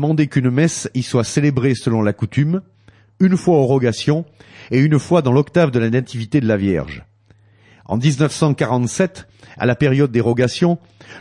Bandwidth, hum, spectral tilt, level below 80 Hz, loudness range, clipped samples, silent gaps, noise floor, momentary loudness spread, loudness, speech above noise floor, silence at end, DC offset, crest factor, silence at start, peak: 11.5 kHz; none; -6.5 dB/octave; -50 dBFS; 3 LU; under 0.1%; none; -52 dBFS; 7 LU; -17 LUFS; 35 dB; 0 s; under 0.1%; 14 dB; 0 s; -4 dBFS